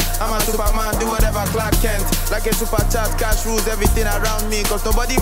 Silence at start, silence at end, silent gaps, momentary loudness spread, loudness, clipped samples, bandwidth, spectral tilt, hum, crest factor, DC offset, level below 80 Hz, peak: 0 s; 0 s; none; 2 LU; -19 LUFS; under 0.1%; 16.5 kHz; -4 dB/octave; none; 14 dB; under 0.1%; -20 dBFS; -4 dBFS